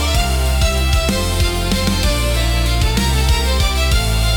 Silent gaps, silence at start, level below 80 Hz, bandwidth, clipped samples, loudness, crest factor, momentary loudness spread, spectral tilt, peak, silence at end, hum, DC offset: none; 0 s; -18 dBFS; 17.5 kHz; under 0.1%; -16 LUFS; 12 dB; 1 LU; -4 dB/octave; -2 dBFS; 0 s; none; under 0.1%